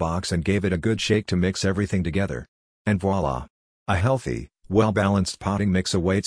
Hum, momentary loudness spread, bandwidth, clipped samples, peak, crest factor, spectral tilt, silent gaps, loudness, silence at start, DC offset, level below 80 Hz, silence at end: none; 9 LU; 10.5 kHz; under 0.1%; -6 dBFS; 18 dB; -6 dB/octave; 2.48-2.85 s, 3.50-3.86 s; -24 LUFS; 0 s; under 0.1%; -42 dBFS; 0 s